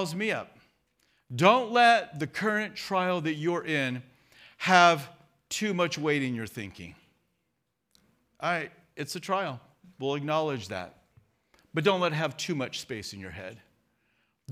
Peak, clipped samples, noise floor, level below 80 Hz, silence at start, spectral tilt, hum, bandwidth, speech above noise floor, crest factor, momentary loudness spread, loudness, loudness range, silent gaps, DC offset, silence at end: -4 dBFS; under 0.1%; -79 dBFS; -72 dBFS; 0 s; -4.5 dB/octave; none; 15.5 kHz; 52 dB; 26 dB; 19 LU; -27 LUFS; 9 LU; none; under 0.1%; 0 s